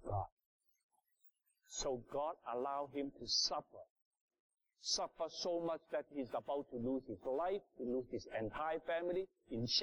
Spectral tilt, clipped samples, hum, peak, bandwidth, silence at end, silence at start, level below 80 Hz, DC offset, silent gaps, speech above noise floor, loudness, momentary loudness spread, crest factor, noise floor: -3.5 dB/octave; under 0.1%; none; -24 dBFS; 18 kHz; 0 s; 0 s; -66 dBFS; under 0.1%; 0.32-0.37 s, 0.46-0.59 s, 0.83-0.89 s, 3.90-3.96 s, 4.02-4.11 s, 4.21-4.28 s, 4.40-4.49 s; 32 dB; -42 LUFS; 8 LU; 20 dB; -74 dBFS